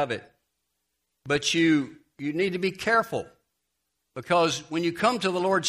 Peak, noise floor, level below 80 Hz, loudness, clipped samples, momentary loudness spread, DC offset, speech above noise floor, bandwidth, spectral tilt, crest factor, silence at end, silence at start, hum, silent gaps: -8 dBFS; -79 dBFS; -66 dBFS; -25 LUFS; under 0.1%; 14 LU; under 0.1%; 54 dB; 15 kHz; -4 dB/octave; 20 dB; 0 s; 0 s; none; none